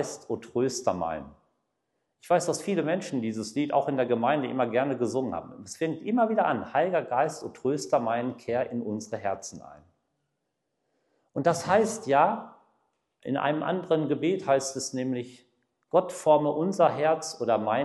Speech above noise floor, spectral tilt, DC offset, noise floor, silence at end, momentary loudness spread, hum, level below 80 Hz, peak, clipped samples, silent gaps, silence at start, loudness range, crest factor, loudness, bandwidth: 53 dB; -5 dB/octave; under 0.1%; -80 dBFS; 0 s; 10 LU; none; -72 dBFS; -8 dBFS; under 0.1%; none; 0 s; 5 LU; 20 dB; -27 LUFS; 12.5 kHz